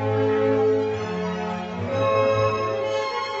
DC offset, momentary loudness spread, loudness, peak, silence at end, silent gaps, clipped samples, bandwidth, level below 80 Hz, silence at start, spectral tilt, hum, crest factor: under 0.1%; 7 LU; -23 LUFS; -10 dBFS; 0 s; none; under 0.1%; 8 kHz; -56 dBFS; 0 s; -6.5 dB/octave; none; 14 dB